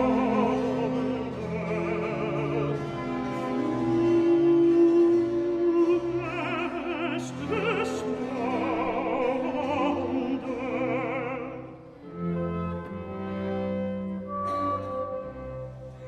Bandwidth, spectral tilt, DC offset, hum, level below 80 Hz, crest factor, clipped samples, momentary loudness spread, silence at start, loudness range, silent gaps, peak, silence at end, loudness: 8.6 kHz; -7.5 dB/octave; under 0.1%; none; -54 dBFS; 14 dB; under 0.1%; 13 LU; 0 s; 9 LU; none; -12 dBFS; 0 s; -27 LUFS